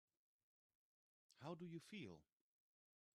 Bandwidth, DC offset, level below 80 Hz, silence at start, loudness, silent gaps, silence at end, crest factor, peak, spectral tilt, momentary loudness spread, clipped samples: 12 kHz; under 0.1%; under -90 dBFS; 1.35 s; -57 LUFS; none; 0.9 s; 20 dB; -40 dBFS; -6 dB/octave; 5 LU; under 0.1%